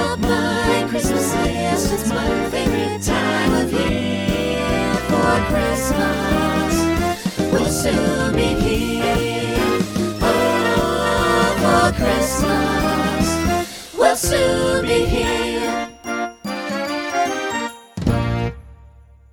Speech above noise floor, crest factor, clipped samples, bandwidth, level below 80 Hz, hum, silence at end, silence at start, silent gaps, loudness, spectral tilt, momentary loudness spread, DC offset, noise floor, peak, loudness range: 27 dB; 18 dB; under 0.1%; over 20 kHz; -32 dBFS; none; 0.45 s; 0 s; none; -19 LUFS; -4.5 dB/octave; 6 LU; under 0.1%; -45 dBFS; -2 dBFS; 4 LU